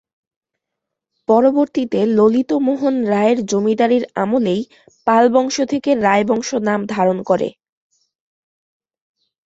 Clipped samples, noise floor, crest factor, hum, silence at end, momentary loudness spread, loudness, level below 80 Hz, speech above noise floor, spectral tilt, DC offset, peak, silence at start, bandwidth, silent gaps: under 0.1%; -81 dBFS; 16 dB; none; 1.95 s; 6 LU; -16 LUFS; -60 dBFS; 65 dB; -5.5 dB/octave; under 0.1%; -2 dBFS; 1.3 s; 8 kHz; none